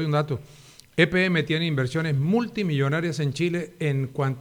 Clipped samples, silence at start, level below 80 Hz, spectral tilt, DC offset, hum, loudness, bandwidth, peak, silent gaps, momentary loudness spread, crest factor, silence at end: under 0.1%; 0 s; -58 dBFS; -6.5 dB/octave; under 0.1%; none; -24 LUFS; 12.5 kHz; -4 dBFS; none; 6 LU; 20 dB; 0 s